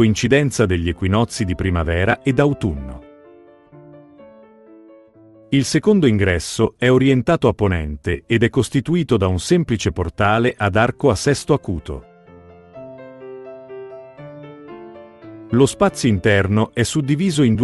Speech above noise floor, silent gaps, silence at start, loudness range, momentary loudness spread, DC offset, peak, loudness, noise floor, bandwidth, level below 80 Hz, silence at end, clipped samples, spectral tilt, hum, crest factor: 30 dB; none; 0 s; 11 LU; 22 LU; under 0.1%; 0 dBFS; -18 LUFS; -47 dBFS; 12 kHz; -40 dBFS; 0 s; under 0.1%; -6 dB/octave; none; 18 dB